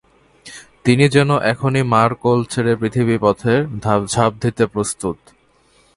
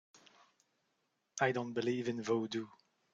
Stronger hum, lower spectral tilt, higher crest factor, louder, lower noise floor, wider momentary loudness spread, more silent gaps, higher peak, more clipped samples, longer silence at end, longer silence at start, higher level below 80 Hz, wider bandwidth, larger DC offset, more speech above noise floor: neither; about the same, -6 dB/octave vs -5 dB/octave; about the same, 18 dB vs 22 dB; first, -17 LUFS vs -37 LUFS; second, -55 dBFS vs -82 dBFS; about the same, 11 LU vs 11 LU; neither; first, 0 dBFS vs -16 dBFS; neither; first, 0.8 s vs 0.45 s; first, 0.45 s vs 0.15 s; first, -48 dBFS vs -80 dBFS; first, 11.5 kHz vs 7.8 kHz; neither; second, 39 dB vs 46 dB